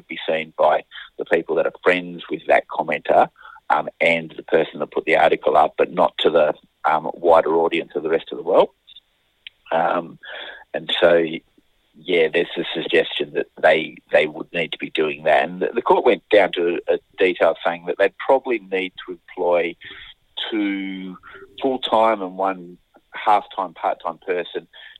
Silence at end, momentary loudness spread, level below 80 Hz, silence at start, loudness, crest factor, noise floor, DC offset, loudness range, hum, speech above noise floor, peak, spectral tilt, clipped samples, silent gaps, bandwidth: 0.1 s; 14 LU; -60 dBFS; 0.1 s; -20 LUFS; 20 dB; -53 dBFS; under 0.1%; 4 LU; none; 33 dB; -2 dBFS; -5.5 dB/octave; under 0.1%; none; 10 kHz